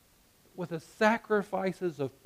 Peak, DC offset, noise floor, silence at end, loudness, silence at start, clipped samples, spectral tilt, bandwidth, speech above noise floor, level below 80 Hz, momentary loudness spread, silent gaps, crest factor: -12 dBFS; under 0.1%; -64 dBFS; 0.15 s; -31 LUFS; 0.55 s; under 0.1%; -6 dB/octave; 15.5 kHz; 33 dB; -70 dBFS; 13 LU; none; 20 dB